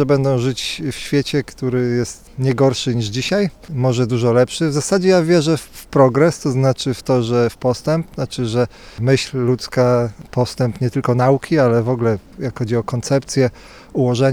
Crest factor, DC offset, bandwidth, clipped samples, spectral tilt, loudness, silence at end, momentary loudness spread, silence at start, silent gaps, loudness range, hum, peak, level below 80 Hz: 16 dB; under 0.1%; 14.5 kHz; under 0.1%; -6 dB/octave; -18 LUFS; 0 s; 8 LU; 0 s; none; 3 LU; none; 0 dBFS; -46 dBFS